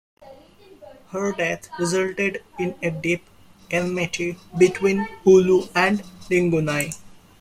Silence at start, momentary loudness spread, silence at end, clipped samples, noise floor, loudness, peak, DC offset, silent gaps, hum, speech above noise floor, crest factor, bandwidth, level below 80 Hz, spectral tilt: 0.2 s; 12 LU; 0.3 s; under 0.1%; -49 dBFS; -22 LUFS; -4 dBFS; under 0.1%; none; none; 28 dB; 18 dB; 15 kHz; -56 dBFS; -5.5 dB/octave